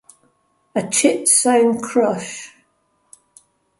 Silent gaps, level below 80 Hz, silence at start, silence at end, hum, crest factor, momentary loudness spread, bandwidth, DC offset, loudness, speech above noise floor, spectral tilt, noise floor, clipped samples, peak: none; -68 dBFS; 0.75 s; 1.35 s; none; 20 dB; 14 LU; 12 kHz; under 0.1%; -16 LUFS; 48 dB; -3 dB/octave; -65 dBFS; under 0.1%; 0 dBFS